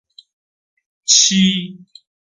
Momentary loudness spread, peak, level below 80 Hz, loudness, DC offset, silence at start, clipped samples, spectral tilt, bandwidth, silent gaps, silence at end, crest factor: 17 LU; 0 dBFS; -62 dBFS; -12 LUFS; under 0.1%; 1.1 s; under 0.1%; -2 dB/octave; 10 kHz; none; 0.55 s; 20 dB